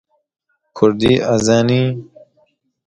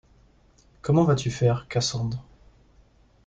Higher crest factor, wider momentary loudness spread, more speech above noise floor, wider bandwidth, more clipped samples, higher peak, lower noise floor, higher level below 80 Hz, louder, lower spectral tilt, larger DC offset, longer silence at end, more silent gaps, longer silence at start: about the same, 16 dB vs 18 dB; second, 6 LU vs 13 LU; first, 46 dB vs 35 dB; first, 10.5 kHz vs 9.2 kHz; neither; first, 0 dBFS vs -8 dBFS; about the same, -60 dBFS vs -58 dBFS; first, -46 dBFS vs -52 dBFS; first, -15 LUFS vs -24 LUFS; about the same, -6 dB/octave vs -6 dB/octave; neither; second, 0.85 s vs 1.05 s; neither; about the same, 0.75 s vs 0.85 s